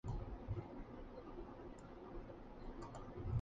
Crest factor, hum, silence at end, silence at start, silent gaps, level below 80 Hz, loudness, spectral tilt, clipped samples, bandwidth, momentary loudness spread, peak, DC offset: 18 dB; none; 0 s; 0.05 s; none; -54 dBFS; -52 LUFS; -8.5 dB/octave; under 0.1%; 7.6 kHz; 7 LU; -30 dBFS; under 0.1%